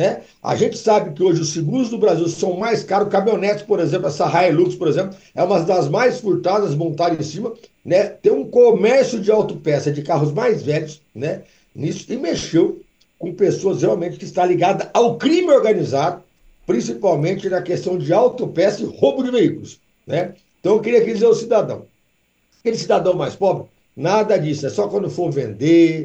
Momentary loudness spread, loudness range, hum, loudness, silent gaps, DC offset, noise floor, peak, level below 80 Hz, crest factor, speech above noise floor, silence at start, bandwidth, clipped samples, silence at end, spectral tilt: 11 LU; 4 LU; none; -18 LUFS; none; under 0.1%; -63 dBFS; -2 dBFS; -60 dBFS; 16 dB; 46 dB; 0 s; 8.4 kHz; under 0.1%; 0 s; -6 dB/octave